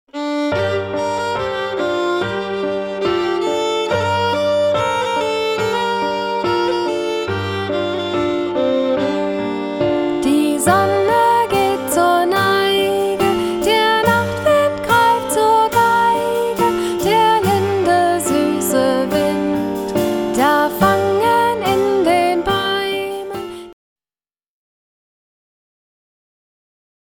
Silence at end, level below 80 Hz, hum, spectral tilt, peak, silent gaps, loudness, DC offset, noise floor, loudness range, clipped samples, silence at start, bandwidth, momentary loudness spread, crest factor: 3.3 s; -48 dBFS; none; -4.5 dB/octave; 0 dBFS; none; -16 LUFS; under 0.1%; under -90 dBFS; 5 LU; under 0.1%; 0.15 s; 19.5 kHz; 7 LU; 16 dB